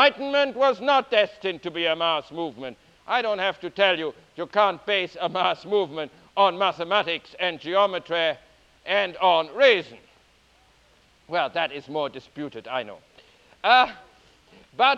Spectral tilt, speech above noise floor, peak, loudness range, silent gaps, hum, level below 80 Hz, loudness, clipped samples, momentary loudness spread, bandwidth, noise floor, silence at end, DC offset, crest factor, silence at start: -4.5 dB/octave; 36 dB; -4 dBFS; 3 LU; none; none; -66 dBFS; -23 LUFS; under 0.1%; 15 LU; 8 kHz; -59 dBFS; 0 s; under 0.1%; 22 dB; 0 s